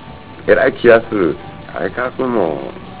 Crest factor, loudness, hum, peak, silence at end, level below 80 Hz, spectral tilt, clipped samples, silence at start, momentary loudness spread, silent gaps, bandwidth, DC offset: 16 dB; -15 LUFS; none; 0 dBFS; 0 s; -42 dBFS; -10 dB/octave; 0.4%; 0 s; 17 LU; none; 4 kHz; 0.8%